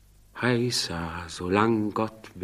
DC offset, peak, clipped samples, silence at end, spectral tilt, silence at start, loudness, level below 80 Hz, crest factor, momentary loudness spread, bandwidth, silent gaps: under 0.1%; -6 dBFS; under 0.1%; 0 s; -5 dB/octave; 0.35 s; -27 LUFS; -54 dBFS; 20 dB; 11 LU; 15 kHz; none